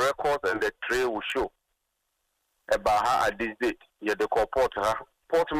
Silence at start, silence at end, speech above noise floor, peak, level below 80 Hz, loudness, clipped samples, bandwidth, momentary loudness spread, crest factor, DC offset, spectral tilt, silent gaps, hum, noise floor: 0 s; 0 s; 52 dB; -14 dBFS; -52 dBFS; -27 LUFS; under 0.1%; 15.5 kHz; 7 LU; 14 dB; under 0.1%; -3.5 dB/octave; none; none; -79 dBFS